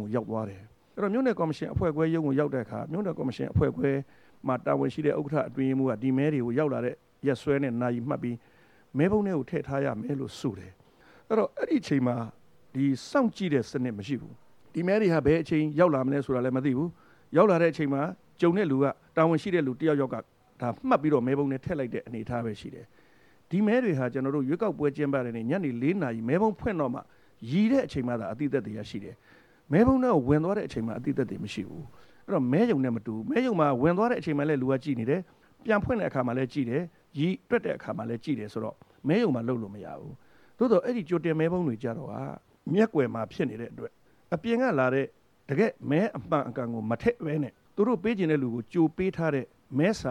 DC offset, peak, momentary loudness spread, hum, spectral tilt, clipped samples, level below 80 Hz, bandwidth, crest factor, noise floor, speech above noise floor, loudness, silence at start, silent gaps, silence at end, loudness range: under 0.1%; -6 dBFS; 11 LU; none; -8 dB/octave; under 0.1%; -56 dBFS; 10.5 kHz; 22 dB; -61 dBFS; 34 dB; -28 LUFS; 0 s; none; 0 s; 4 LU